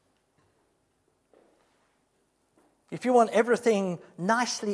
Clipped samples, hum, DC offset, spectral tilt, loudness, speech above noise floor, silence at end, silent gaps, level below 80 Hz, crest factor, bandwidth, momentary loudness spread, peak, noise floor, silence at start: under 0.1%; none; under 0.1%; -4.5 dB/octave; -25 LUFS; 46 dB; 0 s; none; -82 dBFS; 22 dB; 11 kHz; 11 LU; -8 dBFS; -72 dBFS; 2.9 s